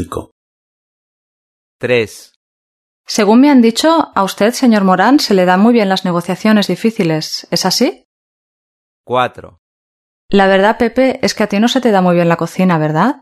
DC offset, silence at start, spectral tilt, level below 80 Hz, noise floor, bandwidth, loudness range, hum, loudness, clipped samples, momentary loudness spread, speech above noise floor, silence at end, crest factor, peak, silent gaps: under 0.1%; 0 s; -5 dB/octave; -48 dBFS; under -90 dBFS; 13.5 kHz; 7 LU; none; -12 LUFS; under 0.1%; 8 LU; over 78 dB; 0.1 s; 14 dB; 0 dBFS; 0.31-1.79 s, 2.36-3.04 s, 8.05-9.04 s, 9.59-10.29 s